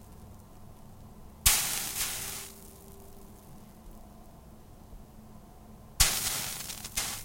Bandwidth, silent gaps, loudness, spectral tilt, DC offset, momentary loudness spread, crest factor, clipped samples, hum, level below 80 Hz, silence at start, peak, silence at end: 16.5 kHz; none; -28 LUFS; -0.5 dB/octave; under 0.1%; 28 LU; 30 dB; under 0.1%; none; -46 dBFS; 0 s; -6 dBFS; 0 s